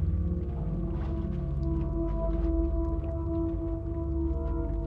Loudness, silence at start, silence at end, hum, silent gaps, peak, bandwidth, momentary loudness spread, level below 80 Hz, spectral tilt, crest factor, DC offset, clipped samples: -32 LUFS; 0 s; 0 s; none; none; -16 dBFS; 3.5 kHz; 3 LU; -32 dBFS; -11.5 dB/octave; 12 dB; under 0.1%; under 0.1%